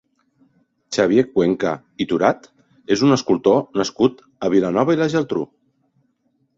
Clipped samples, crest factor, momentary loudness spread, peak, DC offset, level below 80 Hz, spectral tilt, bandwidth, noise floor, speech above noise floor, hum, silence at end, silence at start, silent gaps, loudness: under 0.1%; 18 dB; 10 LU; -2 dBFS; under 0.1%; -58 dBFS; -6 dB/octave; 7.8 kHz; -66 dBFS; 48 dB; none; 1.1 s; 0.9 s; none; -19 LUFS